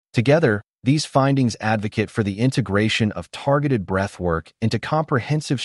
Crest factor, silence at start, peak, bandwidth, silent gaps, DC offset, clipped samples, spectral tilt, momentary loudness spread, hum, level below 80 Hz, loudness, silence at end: 16 dB; 0.15 s; -6 dBFS; 11.5 kHz; 0.70-0.74 s; under 0.1%; under 0.1%; -6 dB/octave; 6 LU; none; -48 dBFS; -21 LUFS; 0 s